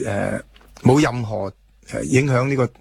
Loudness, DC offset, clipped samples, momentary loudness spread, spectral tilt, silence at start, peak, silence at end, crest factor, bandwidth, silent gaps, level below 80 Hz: -20 LUFS; under 0.1%; under 0.1%; 14 LU; -6.5 dB/octave; 0 s; -2 dBFS; 0.1 s; 18 dB; 13 kHz; none; -46 dBFS